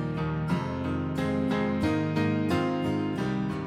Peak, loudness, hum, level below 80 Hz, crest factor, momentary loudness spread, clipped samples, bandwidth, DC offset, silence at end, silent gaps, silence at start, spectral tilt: -14 dBFS; -28 LUFS; none; -50 dBFS; 14 dB; 3 LU; under 0.1%; 13 kHz; under 0.1%; 0 s; none; 0 s; -7.5 dB/octave